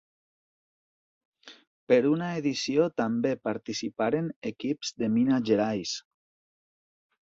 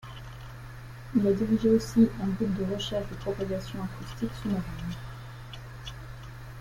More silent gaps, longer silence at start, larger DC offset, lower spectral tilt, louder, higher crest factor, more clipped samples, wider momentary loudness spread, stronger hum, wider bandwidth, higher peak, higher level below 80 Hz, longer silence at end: first, 1.67-1.87 s, 4.36-4.42 s vs none; first, 1.45 s vs 0 s; neither; second, -5.5 dB/octave vs -7 dB/octave; about the same, -28 LUFS vs -29 LUFS; about the same, 20 dB vs 18 dB; neither; second, 9 LU vs 20 LU; neither; second, 8 kHz vs 16.5 kHz; about the same, -8 dBFS vs -10 dBFS; second, -70 dBFS vs -46 dBFS; first, 1.2 s vs 0 s